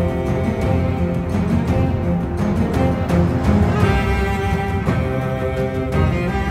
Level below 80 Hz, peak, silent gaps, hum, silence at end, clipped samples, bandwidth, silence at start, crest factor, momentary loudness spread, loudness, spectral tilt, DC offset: -26 dBFS; -4 dBFS; none; none; 0 s; under 0.1%; 14.5 kHz; 0 s; 14 dB; 4 LU; -19 LUFS; -8 dB/octave; under 0.1%